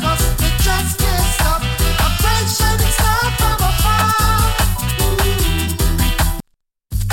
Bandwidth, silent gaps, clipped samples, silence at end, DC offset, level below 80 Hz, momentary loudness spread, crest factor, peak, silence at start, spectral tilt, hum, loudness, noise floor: 17.5 kHz; none; under 0.1%; 0 s; under 0.1%; -18 dBFS; 4 LU; 12 dB; -2 dBFS; 0 s; -3.5 dB/octave; none; -16 LUFS; -63 dBFS